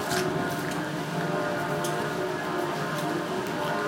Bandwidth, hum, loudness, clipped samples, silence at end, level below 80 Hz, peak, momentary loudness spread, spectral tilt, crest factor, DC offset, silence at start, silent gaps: 17 kHz; none; -29 LUFS; under 0.1%; 0 s; -60 dBFS; -14 dBFS; 2 LU; -4.5 dB/octave; 14 dB; under 0.1%; 0 s; none